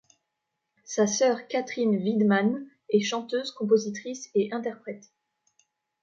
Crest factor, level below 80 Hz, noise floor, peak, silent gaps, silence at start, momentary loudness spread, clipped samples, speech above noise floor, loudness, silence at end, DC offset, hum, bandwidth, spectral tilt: 18 dB; -78 dBFS; -82 dBFS; -10 dBFS; none; 0.9 s; 12 LU; under 0.1%; 56 dB; -26 LUFS; 1.05 s; under 0.1%; none; 7.6 kHz; -4.5 dB/octave